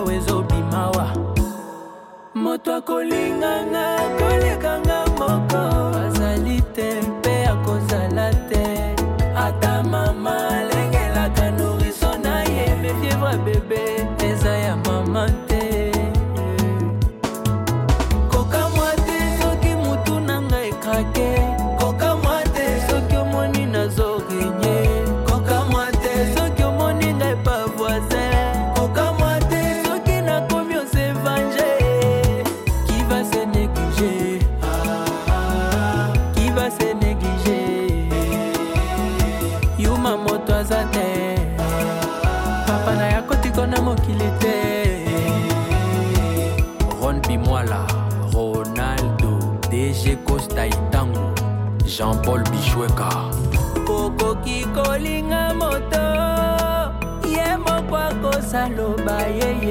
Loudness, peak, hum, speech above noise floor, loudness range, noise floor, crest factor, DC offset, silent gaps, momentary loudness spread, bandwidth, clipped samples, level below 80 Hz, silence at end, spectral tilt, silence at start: -20 LUFS; -8 dBFS; none; 20 dB; 1 LU; -40 dBFS; 12 dB; under 0.1%; none; 3 LU; 17 kHz; under 0.1%; -26 dBFS; 0 s; -6 dB/octave; 0 s